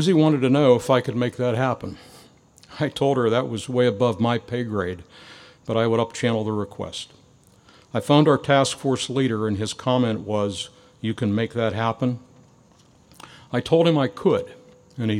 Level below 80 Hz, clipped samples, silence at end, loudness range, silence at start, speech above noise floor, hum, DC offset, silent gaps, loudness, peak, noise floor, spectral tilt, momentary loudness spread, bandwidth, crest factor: -60 dBFS; under 0.1%; 0 s; 5 LU; 0 s; 33 dB; none; under 0.1%; none; -22 LUFS; -2 dBFS; -55 dBFS; -6 dB/octave; 14 LU; 14.5 kHz; 20 dB